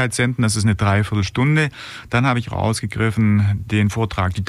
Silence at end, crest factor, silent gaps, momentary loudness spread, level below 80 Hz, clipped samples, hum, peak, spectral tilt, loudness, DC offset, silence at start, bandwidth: 0 s; 14 dB; none; 5 LU; -40 dBFS; under 0.1%; none; -6 dBFS; -5.5 dB/octave; -19 LUFS; under 0.1%; 0 s; 13 kHz